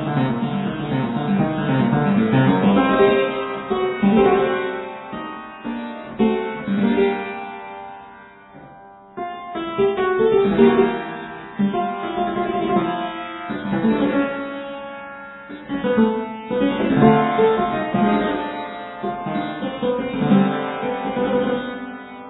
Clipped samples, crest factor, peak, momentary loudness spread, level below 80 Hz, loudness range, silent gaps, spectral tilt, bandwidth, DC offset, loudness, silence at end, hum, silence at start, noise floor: under 0.1%; 18 dB; -2 dBFS; 16 LU; -50 dBFS; 6 LU; none; -11 dB/octave; 4.1 kHz; under 0.1%; -20 LUFS; 0 s; none; 0 s; -43 dBFS